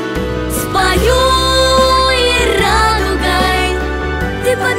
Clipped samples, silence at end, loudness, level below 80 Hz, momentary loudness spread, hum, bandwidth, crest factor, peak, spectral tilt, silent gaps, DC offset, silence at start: under 0.1%; 0 s; -12 LUFS; -22 dBFS; 8 LU; none; 16.5 kHz; 12 dB; 0 dBFS; -4 dB/octave; none; under 0.1%; 0 s